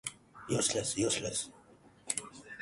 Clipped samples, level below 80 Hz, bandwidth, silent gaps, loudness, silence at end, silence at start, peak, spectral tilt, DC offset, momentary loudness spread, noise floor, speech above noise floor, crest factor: under 0.1%; -64 dBFS; 12 kHz; none; -33 LUFS; 0 s; 0.05 s; -14 dBFS; -3 dB/octave; under 0.1%; 15 LU; -60 dBFS; 27 dB; 22 dB